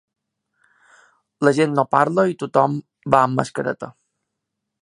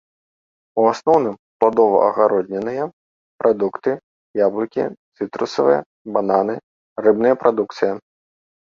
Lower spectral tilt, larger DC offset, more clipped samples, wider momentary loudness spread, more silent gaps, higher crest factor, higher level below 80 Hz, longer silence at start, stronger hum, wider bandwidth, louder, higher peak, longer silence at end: about the same, -6.5 dB/octave vs -6.5 dB/octave; neither; neither; about the same, 11 LU vs 13 LU; second, none vs 1.39-1.60 s, 2.93-3.39 s, 4.03-4.34 s, 4.97-5.12 s, 5.86-6.05 s, 6.63-6.96 s; about the same, 20 dB vs 18 dB; about the same, -62 dBFS vs -64 dBFS; first, 1.4 s vs 0.75 s; neither; first, 11 kHz vs 7.4 kHz; about the same, -19 LUFS vs -19 LUFS; about the same, 0 dBFS vs 0 dBFS; first, 0.9 s vs 0.75 s